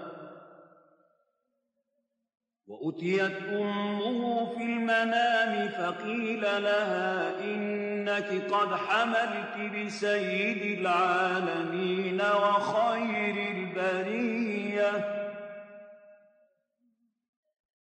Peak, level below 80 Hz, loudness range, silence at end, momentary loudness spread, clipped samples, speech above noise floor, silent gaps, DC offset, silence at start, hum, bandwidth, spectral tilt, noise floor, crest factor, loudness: -14 dBFS; -86 dBFS; 7 LU; 1.85 s; 8 LU; under 0.1%; 52 dB; none; under 0.1%; 0 s; none; 9.6 kHz; -5.5 dB/octave; -80 dBFS; 16 dB; -29 LUFS